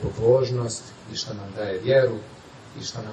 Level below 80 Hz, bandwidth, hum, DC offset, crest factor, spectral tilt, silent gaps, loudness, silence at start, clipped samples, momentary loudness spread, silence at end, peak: -52 dBFS; 9.2 kHz; none; under 0.1%; 18 dB; -5.5 dB/octave; none; -24 LUFS; 0 s; under 0.1%; 18 LU; 0 s; -6 dBFS